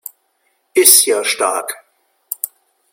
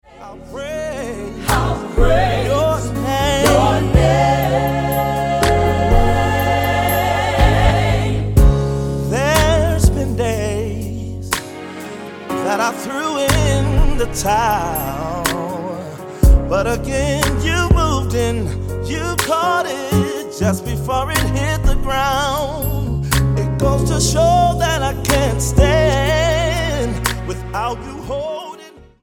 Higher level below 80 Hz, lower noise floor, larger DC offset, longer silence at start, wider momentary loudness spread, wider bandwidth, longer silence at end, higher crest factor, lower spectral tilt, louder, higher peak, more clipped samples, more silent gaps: second, -66 dBFS vs -22 dBFS; first, -64 dBFS vs -40 dBFS; neither; first, 0.75 s vs 0.15 s; first, 21 LU vs 11 LU; first, over 20 kHz vs 17.5 kHz; first, 0.45 s vs 0.2 s; about the same, 18 dB vs 16 dB; second, 1 dB/octave vs -5 dB/octave; first, -12 LUFS vs -17 LUFS; about the same, 0 dBFS vs 0 dBFS; first, 0.2% vs under 0.1%; neither